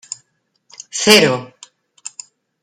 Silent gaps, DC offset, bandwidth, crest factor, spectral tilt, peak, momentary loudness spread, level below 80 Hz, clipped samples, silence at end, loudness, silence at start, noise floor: none; under 0.1%; 16 kHz; 18 dB; -2.5 dB/octave; 0 dBFS; 24 LU; -60 dBFS; under 0.1%; 0.55 s; -13 LUFS; 0.95 s; -65 dBFS